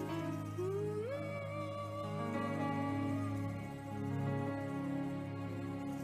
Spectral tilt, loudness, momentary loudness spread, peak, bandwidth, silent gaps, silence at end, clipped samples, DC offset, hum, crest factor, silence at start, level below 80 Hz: -7.5 dB/octave; -40 LUFS; 5 LU; -26 dBFS; 15 kHz; none; 0 s; under 0.1%; under 0.1%; none; 14 dB; 0 s; -68 dBFS